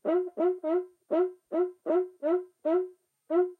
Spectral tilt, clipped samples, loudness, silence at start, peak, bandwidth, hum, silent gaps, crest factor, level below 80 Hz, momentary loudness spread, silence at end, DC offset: -7.5 dB/octave; under 0.1%; -30 LUFS; 0.05 s; -16 dBFS; 3.9 kHz; none; none; 14 dB; under -90 dBFS; 3 LU; 0.05 s; under 0.1%